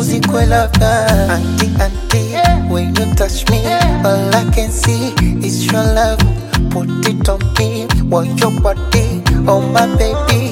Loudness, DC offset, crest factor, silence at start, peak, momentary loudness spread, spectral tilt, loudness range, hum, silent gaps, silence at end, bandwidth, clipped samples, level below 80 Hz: -13 LUFS; under 0.1%; 12 dB; 0 s; 0 dBFS; 4 LU; -5.5 dB/octave; 1 LU; none; none; 0 s; 17 kHz; under 0.1%; -18 dBFS